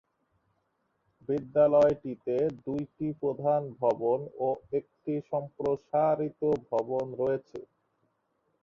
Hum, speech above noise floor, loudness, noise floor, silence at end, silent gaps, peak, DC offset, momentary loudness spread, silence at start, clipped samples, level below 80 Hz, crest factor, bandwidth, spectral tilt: none; 47 dB; -29 LUFS; -76 dBFS; 1 s; none; -12 dBFS; under 0.1%; 11 LU; 1.3 s; under 0.1%; -66 dBFS; 18 dB; 7.2 kHz; -9 dB/octave